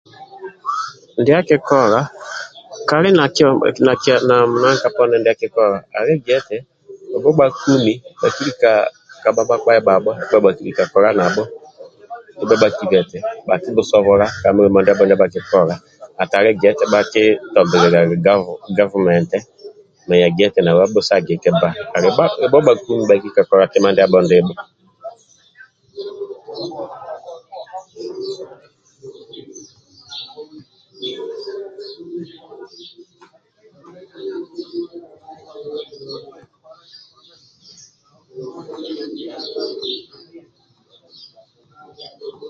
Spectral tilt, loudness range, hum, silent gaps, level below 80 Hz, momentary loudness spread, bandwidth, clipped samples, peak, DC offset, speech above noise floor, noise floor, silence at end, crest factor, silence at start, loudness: -5.5 dB/octave; 19 LU; none; none; -54 dBFS; 21 LU; 7.6 kHz; under 0.1%; 0 dBFS; under 0.1%; 42 dB; -56 dBFS; 0 s; 16 dB; 0.2 s; -15 LUFS